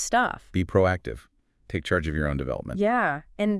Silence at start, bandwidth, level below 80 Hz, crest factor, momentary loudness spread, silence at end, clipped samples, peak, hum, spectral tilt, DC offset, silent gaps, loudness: 0 s; 12 kHz; -42 dBFS; 18 dB; 10 LU; 0 s; under 0.1%; -8 dBFS; none; -5.5 dB/octave; under 0.1%; none; -26 LUFS